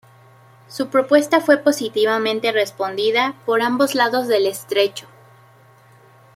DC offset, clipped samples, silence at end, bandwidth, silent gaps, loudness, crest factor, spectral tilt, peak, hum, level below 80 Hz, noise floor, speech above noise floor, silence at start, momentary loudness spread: under 0.1%; under 0.1%; 1.35 s; 16 kHz; none; -18 LUFS; 18 dB; -3.5 dB/octave; -2 dBFS; none; -70 dBFS; -49 dBFS; 31 dB; 0.7 s; 6 LU